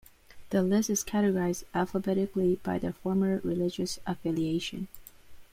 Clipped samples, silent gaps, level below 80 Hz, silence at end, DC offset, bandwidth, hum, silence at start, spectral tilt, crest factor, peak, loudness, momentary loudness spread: under 0.1%; none; -56 dBFS; 0.1 s; under 0.1%; 16 kHz; none; 0.35 s; -5.5 dB/octave; 16 dB; -14 dBFS; -30 LUFS; 7 LU